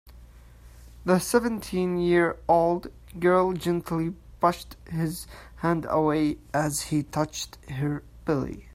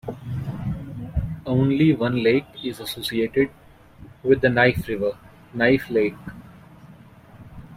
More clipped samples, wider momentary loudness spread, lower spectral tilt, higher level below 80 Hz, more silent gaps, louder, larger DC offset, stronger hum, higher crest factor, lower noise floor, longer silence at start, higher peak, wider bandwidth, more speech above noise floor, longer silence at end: neither; about the same, 12 LU vs 13 LU; second, -5.5 dB/octave vs -7 dB/octave; about the same, -48 dBFS vs -44 dBFS; neither; second, -26 LUFS vs -22 LUFS; neither; neither; about the same, 20 dB vs 20 dB; about the same, -49 dBFS vs -47 dBFS; about the same, 0.05 s vs 0.05 s; second, -6 dBFS vs -2 dBFS; about the same, 16 kHz vs 16 kHz; about the same, 23 dB vs 26 dB; about the same, 0 s vs 0 s